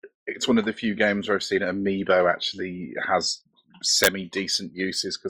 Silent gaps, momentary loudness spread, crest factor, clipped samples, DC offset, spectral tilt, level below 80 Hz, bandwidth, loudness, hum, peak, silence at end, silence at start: 0.15-0.26 s; 10 LU; 22 dB; under 0.1%; under 0.1%; -3 dB/octave; -62 dBFS; 16 kHz; -24 LUFS; none; -4 dBFS; 0 s; 0.05 s